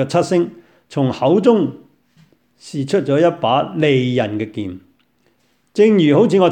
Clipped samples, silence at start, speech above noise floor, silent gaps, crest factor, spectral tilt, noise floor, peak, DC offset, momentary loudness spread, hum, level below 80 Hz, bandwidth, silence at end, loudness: under 0.1%; 0 s; 46 dB; none; 16 dB; -7 dB/octave; -61 dBFS; 0 dBFS; under 0.1%; 14 LU; none; -60 dBFS; 9.8 kHz; 0 s; -16 LUFS